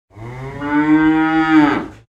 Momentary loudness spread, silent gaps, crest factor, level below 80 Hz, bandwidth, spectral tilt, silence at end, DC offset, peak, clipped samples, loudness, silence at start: 17 LU; none; 14 dB; -44 dBFS; 7.4 kHz; -7 dB/octave; 0.15 s; under 0.1%; -2 dBFS; under 0.1%; -14 LUFS; 0.15 s